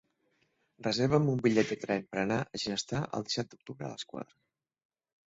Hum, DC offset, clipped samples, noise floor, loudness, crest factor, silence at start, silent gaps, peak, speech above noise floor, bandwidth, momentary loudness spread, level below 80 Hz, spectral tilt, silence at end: none; under 0.1%; under 0.1%; -75 dBFS; -32 LUFS; 20 dB; 0.8 s; none; -12 dBFS; 43 dB; 8 kHz; 15 LU; -64 dBFS; -5.5 dB/octave; 1.1 s